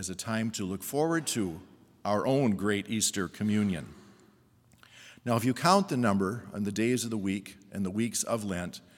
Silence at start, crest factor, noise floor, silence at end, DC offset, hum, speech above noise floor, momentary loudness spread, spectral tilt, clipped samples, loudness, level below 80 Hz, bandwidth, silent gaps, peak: 0 s; 22 dB; -62 dBFS; 0.2 s; under 0.1%; none; 33 dB; 11 LU; -4.5 dB/octave; under 0.1%; -30 LUFS; -70 dBFS; 18 kHz; none; -8 dBFS